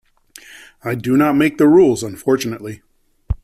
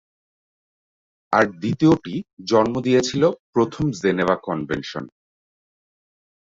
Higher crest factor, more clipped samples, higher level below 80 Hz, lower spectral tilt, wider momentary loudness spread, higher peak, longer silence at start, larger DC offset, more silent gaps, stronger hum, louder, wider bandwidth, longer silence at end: second, 14 dB vs 20 dB; neither; first, -38 dBFS vs -54 dBFS; about the same, -6 dB/octave vs -6 dB/octave; first, 18 LU vs 12 LU; about the same, -2 dBFS vs -2 dBFS; second, 0.55 s vs 1.3 s; neither; second, none vs 2.33-2.37 s, 3.40-3.53 s; neither; first, -15 LUFS vs -21 LUFS; first, 15 kHz vs 7.8 kHz; second, 0.1 s vs 1.4 s